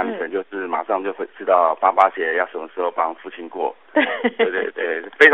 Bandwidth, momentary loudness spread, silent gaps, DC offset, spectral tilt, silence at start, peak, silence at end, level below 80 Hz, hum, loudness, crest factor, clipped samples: 4.2 kHz; 11 LU; none; 0.2%; 0 dB/octave; 0 s; 0 dBFS; 0 s; -72 dBFS; none; -20 LUFS; 20 dB; under 0.1%